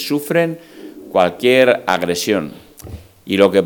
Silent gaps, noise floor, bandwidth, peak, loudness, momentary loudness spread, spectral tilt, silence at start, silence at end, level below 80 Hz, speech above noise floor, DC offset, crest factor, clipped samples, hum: none; -35 dBFS; 19.5 kHz; 0 dBFS; -16 LUFS; 23 LU; -4.5 dB/octave; 0 s; 0 s; -52 dBFS; 20 dB; under 0.1%; 16 dB; under 0.1%; none